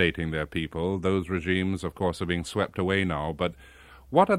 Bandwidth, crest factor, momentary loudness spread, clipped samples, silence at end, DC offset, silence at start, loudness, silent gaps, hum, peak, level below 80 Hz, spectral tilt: 14 kHz; 22 dB; 5 LU; under 0.1%; 0 s; under 0.1%; 0 s; -28 LUFS; none; none; -6 dBFS; -48 dBFS; -6 dB/octave